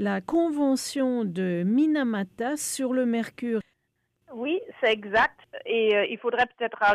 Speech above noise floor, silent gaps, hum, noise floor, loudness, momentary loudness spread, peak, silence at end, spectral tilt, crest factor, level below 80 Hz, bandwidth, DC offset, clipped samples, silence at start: 50 dB; none; none; -76 dBFS; -26 LUFS; 7 LU; -12 dBFS; 0 s; -4.5 dB/octave; 14 dB; -64 dBFS; 15.5 kHz; under 0.1%; under 0.1%; 0 s